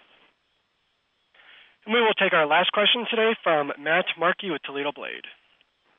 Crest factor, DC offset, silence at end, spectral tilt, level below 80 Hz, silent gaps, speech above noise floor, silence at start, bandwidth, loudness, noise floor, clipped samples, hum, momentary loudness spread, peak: 16 dB; under 0.1%; 0.65 s; -7 dB/octave; -84 dBFS; none; 48 dB; 1.85 s; 4 kHz; -22 LUFS; -71 dBFS; under 0.1%; none; 16 LU; -8 dBFS